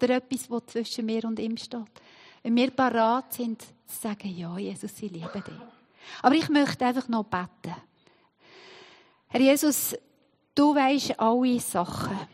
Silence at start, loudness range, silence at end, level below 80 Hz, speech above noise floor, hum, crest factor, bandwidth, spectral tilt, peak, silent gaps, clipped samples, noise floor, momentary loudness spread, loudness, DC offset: 0 s; 5 LU; 0.05 s; -68 dBFS; 40 dB; none; 22 dB; 15.5 kHz; -4 dB/octave; -4 dBFS; none; under 0.1%; -66 dBFS; 17 LU; -26 LUFS; under 0.1%